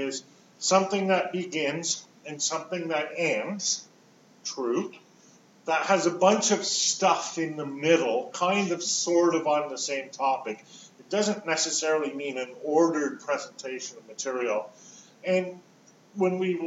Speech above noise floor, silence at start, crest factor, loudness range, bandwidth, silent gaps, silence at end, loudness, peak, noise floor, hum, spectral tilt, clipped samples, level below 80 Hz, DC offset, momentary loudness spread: 31 dB; 0 s; 20 dB; 6 LU; 8.2 kHz; none; 0 s; -27 LUFS; -6 dBFS; -58 dBFS; none; -3 dB/octave; under 0.1%; under -90 dBFS; under 0.1%; 13 LU